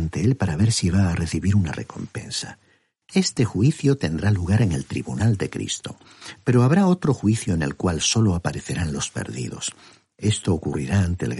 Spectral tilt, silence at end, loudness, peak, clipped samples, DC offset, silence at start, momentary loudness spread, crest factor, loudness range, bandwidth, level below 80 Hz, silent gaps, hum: -5.5 dB/octave; 0 s; -22 LUFS; -6 dBFS; under 0.1%; under 0.1%; 0 s; 10 LU; 16 dB; 3 LU; 11.5 kHz; -42 dBFS; none; none